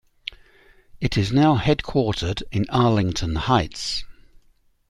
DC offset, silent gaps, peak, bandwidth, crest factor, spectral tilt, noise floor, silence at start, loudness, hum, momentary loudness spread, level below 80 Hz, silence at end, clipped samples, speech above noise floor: under 0.1%; none; -4 dBFS; 12 kHz; 18 dB; -6 dB/octave; -59 dBFS; 0.3 s; -22 LUFS; none; 11 LU; -40 dBFS; 0.75 s; under 0.1%; 38 dB